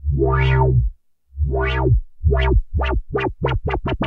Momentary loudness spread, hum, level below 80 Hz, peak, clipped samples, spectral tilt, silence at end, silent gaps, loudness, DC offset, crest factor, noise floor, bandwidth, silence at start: 7 LU; none; -22 dBFS; -6 dBFS; under 0.1%; -9 dB/octave; 0 s; none; -20 LUFS; under 0.1%; 12 dB; -40 dBFS; 4.8 kHz; 0 s